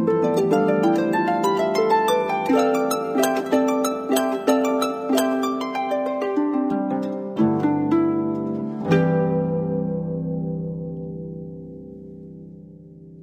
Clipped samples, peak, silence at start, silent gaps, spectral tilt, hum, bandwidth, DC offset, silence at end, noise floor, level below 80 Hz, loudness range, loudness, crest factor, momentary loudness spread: under 0.1%; -6 dBFS; 0 s; none; -6 dB/octave; none; 15.5 kHz; under 0.1%; 0 s; -43 dBFS; -56 dBFS; 7 LU; -22 LUFS; 16 dB; 15 LU